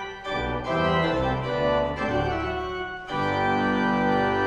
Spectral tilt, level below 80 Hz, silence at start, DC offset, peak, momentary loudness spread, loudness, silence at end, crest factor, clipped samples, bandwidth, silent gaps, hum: -6.5 dB/octave; -42 dBFS; 0 s; under 0.1%; -12 dBFS; 7 LU; -25 LUFS; 0 s; 14 dB; under 0.1%; 9.8 kHz; none; none